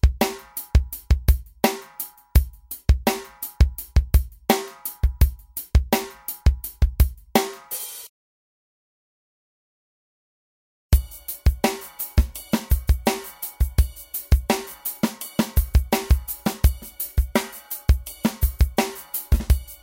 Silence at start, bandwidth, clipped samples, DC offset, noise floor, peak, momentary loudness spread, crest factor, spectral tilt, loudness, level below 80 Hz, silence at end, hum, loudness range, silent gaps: 0.05 s; 17 kHz; under 0.1%; under 0.1%; -38 dBFS; -2 dBFS; 9 LU; 20 dB; -5.5 dB/octave; -24 LUFS; -24 dBFS; 0.1 s; none; 5 LU; 8.09-10.90 s